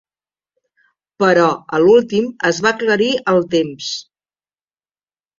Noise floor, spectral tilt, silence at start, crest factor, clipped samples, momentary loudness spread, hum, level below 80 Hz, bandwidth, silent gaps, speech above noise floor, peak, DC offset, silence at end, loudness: under -90 dBFS; -4.5 dB/octave; 1.2 s; 16 dB; under 0.1%; 10 LU; none; -60 dBFS; 7.6 kHz; none; over 75 dB; -2 dBFS; under 0.1%; 1.4 s; -15 LUFS